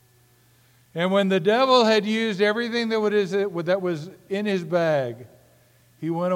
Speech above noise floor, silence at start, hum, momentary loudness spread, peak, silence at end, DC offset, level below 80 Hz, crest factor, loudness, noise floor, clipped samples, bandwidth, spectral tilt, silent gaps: 36 dB; 0.95 s; none; 14 LU; -4 dBFS; 0 s; under 0.1%; -74 dBFS; 18 dB; -22 LUFS; -58 dBFS; under 0.1%; 16 kHz; -5.5 dB/octave; none